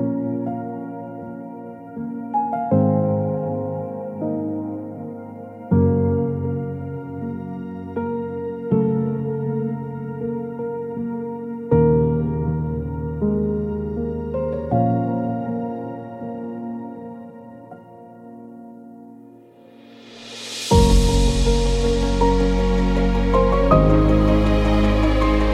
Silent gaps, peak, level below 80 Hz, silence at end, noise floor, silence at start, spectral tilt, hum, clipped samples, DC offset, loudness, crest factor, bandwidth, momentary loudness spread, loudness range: none; -2 dBFS; -26 dBFS; 0 s; -46 dBFS; 0 s; -7 dB/octave; none; under 0.1%; under 0.1%; -21 LUFS; 18 dB; 12.5 kHz; 19 LU; 14 LU